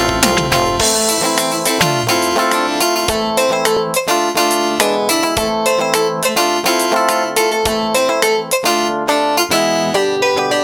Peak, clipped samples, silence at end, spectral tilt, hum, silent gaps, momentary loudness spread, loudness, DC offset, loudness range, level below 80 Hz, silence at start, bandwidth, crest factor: 0 dBFS; under 0.1%; 0 s; -2.5 dB/octave; none; none; 2 LU; -14 LUFS; under 0.1%; 1 LU; -40 dBFS; 0 s; over 20 kHz; 14 dB